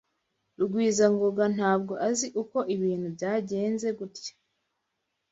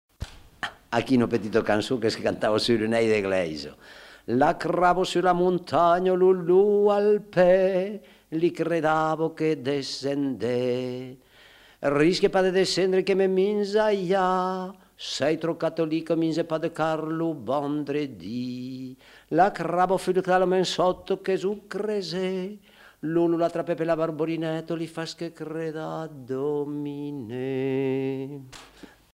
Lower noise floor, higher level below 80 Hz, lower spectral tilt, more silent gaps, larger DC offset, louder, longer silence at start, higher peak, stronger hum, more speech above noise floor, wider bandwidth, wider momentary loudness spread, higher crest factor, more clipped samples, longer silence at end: first, -80 dBFS vs -53 dBFS; second, -72 dBFS vs -56 dBFS; about the same, -5 dB/octave vs -6 dB/octave; neither; neither; about the same, -27 LUFS vs -25 LUFS; first, 0.6 s vs 0.2 s; second, -10 dBFS vs -6 dBFS; neither; first, 54 dB vs 29 dB; second, 8 kHz vs 13.5 kHz; second, 10 LU vs 13 LU; about the same, 18 dB vs 18 dB; neither; first, 1 s vs 0.5 s